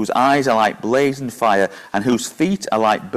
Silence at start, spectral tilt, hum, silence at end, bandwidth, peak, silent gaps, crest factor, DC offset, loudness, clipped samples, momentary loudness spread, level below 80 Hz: 0 s; -4.5 dB/octave; none; 0 s; 15.5 kHz; -4 dBFS; none; 14 dB; under 0.1%; -18 LUFS; under 0.1%; 5 LU; -56 dBFS